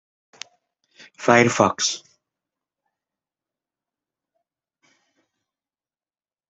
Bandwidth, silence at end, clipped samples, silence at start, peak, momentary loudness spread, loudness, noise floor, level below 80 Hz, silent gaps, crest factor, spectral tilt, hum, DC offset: 8.2 kHz; 4.5 s; under 0.1%; 1.2 s; -2 dBFS; 25 LU; -19 LUFS; under -90 dBFS; -68 dBFS; none; 26 dB; -3.5 dB/octave; none; under 0.1%